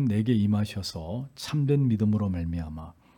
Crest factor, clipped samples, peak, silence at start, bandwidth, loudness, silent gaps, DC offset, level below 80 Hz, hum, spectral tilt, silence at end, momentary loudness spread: 14 dB; under 0.1%; -12 dBFS; 0 s; 17 kHz; -27 LUFS; none; under 0.1%; -52 dBFS; none; -7.5 dB/octave; 0.25 s; 11 LU